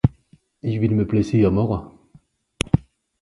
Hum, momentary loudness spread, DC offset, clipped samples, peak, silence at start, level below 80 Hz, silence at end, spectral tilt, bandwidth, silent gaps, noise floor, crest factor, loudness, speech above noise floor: none; 11 LU; under 0.1%; under 0.1%; 0 dBFS; 0.05 s; -38 dBFS; 0.45 s; -7.5 dB/octave; 11.5 kHz; none; -57 dBFS; 22 dB; -21 LUFS; 37 dB